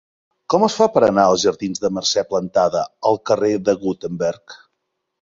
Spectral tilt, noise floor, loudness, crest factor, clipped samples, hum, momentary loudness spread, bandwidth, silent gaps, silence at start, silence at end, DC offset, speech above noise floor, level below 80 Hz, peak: -4.5 dB/octave; -75 dBFS; -18 LUFS; 18 dB; under 0.1%; none; 9 LU; 7.8 kHz; none; 0.5 s; 0.65 s; under 0.1%; 57 dB; -56 dBFS; 0 dBFS